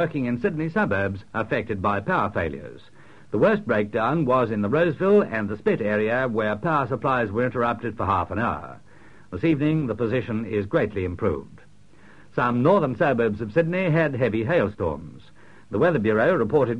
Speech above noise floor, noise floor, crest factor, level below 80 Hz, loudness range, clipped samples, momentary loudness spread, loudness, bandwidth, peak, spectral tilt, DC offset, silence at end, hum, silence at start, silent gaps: 30 dB; -53 dBFS; 16 dB; -52 dBFS; 4 LU; under 0.1%; 8 LU; -23 LUFS; 9.8 kHz; -8 dBFS; -8.5 dB/octave; 0.4%; 0 s; none; 0 s; none